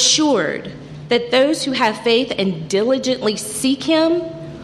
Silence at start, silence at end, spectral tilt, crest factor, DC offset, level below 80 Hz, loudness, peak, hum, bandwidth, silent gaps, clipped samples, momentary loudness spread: 0 s; 0 s; -3 dB/octave; 14 dB; under 0.1%; -54 dBFS; -17 LUFS; -2 dBFS; none; 14.5 kHz; none; under 0.1%; 8 LU